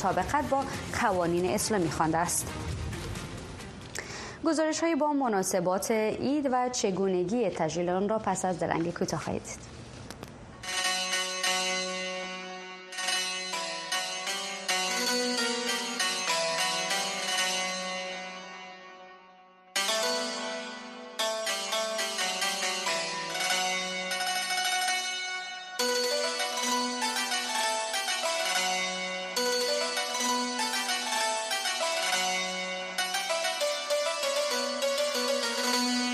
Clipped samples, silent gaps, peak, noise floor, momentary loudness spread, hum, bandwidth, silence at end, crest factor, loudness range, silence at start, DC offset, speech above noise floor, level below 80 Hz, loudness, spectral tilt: under 0.1%; none; -12 dBFS; -55 dBFS; 11 LU; none; 13 kHz; 0 s; 18 dB; 3 LU; 0 s; under 0.1%; 27 dB; -56 dBFS; -29 LUFS; -2 dB/octave